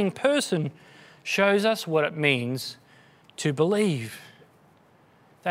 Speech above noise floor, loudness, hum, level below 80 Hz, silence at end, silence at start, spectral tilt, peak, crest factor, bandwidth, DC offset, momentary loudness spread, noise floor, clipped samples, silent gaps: 34 dB; -25 LUFS; none; -74 dBFS; 0 s; 0 s; -5 dB/octave; -6 dBFS; 22 dB; 16 kHz; under 0.1%; 16 LU; -58 dBFS; under 0.1%; none